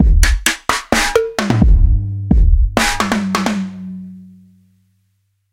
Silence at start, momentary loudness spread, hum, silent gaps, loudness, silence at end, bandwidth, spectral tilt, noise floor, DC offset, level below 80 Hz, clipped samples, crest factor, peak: 0 s; 13 LU; none; none; -15 LUFS; 1.3 s; 17 kHz; -4.5 dB/octave; -64 dBFS; under 0.1%; -16 dBFS; under 0.1%; 14 dB; 0 dBFS